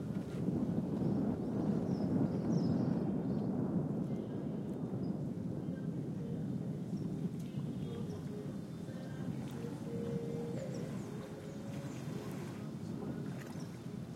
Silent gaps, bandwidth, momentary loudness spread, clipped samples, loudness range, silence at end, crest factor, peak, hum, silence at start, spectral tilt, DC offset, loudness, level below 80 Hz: none; 15 kHz; 10 LU; under 0.1%; 7 LU; 0 s; 16 dB; -22 dBFS; none; 0 s; -8.5 dB/octave; under 0.1%; -39 LUFS; -66 dBFS